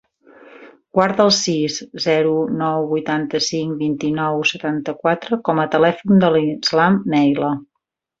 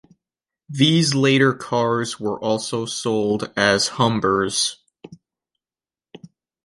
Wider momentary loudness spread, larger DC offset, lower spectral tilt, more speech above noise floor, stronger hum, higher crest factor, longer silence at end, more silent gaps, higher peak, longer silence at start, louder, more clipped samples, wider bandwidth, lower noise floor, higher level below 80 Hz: about the same, 7 LU vs 8 LU; neither; about the same, -5 dB/octave vs -4 dB/octave; second, 60 dB vs over 71 dB; neither; about the same, 18 dB vs 18 dB; first, 0.55 s vs 0.4 s; neither; about the same, 0 dBFS vs -2 dBFS; second, 0.4 s vs 0.7 s; about the same, -18 LUFS vs -19 LUFS; neither; second, 8 kHz vs 11.5 kHz; second, -77 dBFS vs under -90 dBFS; about the same, -58 dBFS vs -56 dBFS